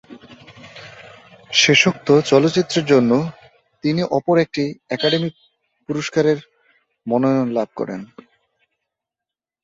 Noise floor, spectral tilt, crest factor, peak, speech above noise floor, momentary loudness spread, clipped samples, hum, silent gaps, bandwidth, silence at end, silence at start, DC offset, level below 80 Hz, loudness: -87 dBFS; -4.5 dB/octave; 18 dB; -2 dBFS; 70 dB; 18 LU; under 0.1%; none; none; 8 kHz; 1.6 s; 0.1 s; under 0.1%; -60 dBFS; -18 LUFS